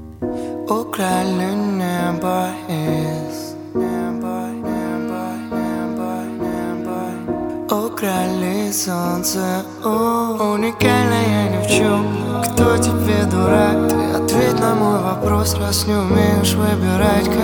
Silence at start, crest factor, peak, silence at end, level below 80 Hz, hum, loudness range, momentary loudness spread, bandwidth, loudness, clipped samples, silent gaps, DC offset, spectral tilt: 0 s; 18 dB; 0 dBFS; 0 s; -40 dBFS; none; 7 LU; 9 LU; 18 kHz; -18 LUFS; under 0.1%; none; under 0.1%; -5.5 dB/octave